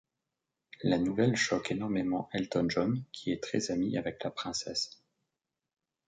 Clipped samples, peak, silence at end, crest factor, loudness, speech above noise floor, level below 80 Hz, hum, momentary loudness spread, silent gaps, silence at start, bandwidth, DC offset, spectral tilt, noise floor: under 0.1%; -14 dBFS; 1.15 s; 20 dB; -32 LUFS; 56 dB; -64 dBFS; none; 8 LU; none; 0.8 s; 9.4 kHz; under 0.1%; -5 dB/octave; -88 dBFS